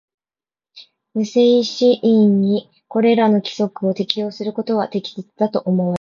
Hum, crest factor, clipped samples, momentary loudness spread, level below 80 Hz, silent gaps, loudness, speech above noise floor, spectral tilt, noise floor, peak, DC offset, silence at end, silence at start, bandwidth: none; 18 dB; under 0.1%; 10 LU; -64 dBFS; none; -18 LUFS; over 73 dB; -7 dB/octave; under -90 dBFS; 0 dBFS; under 0.1%; 0.05 s; 0.75 s; 7.2 kHz